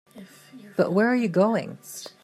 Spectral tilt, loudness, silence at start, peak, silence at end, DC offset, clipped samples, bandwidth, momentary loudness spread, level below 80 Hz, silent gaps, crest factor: -6.5 dB/octave; -23 LUFS; 0.15 s; -8 dBFS; 0.15 s; under 0.1%; under 0.1%; 14.5 kHz; 16 LU; -76 dBFS; none; 16 dB